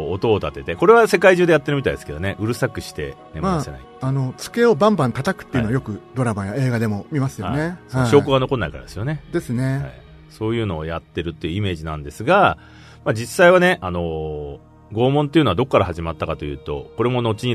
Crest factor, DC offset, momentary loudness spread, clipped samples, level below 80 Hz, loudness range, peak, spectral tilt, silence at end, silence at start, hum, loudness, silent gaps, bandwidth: 20 dB; under 0.1%; 14 LU; under 0.1%; -42 dBFS; 5 LU; 0 dBFS; -6.5 dB/octave; 0 s; 0 s; none; -20 LUFS; none; 13.5 kHz